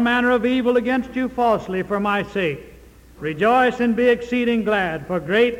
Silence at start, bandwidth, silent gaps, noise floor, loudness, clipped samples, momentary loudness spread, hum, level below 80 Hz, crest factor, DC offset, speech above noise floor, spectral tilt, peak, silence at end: 0 s; 15.5 kHz; none; -45 dBFS; -20 LUFS; under 0.1%; 8 LU; none; -48 dBFS; 14 dB; under 0.1%; 26 dB; -6.5 dB/octave; -6 dBFS; 0 s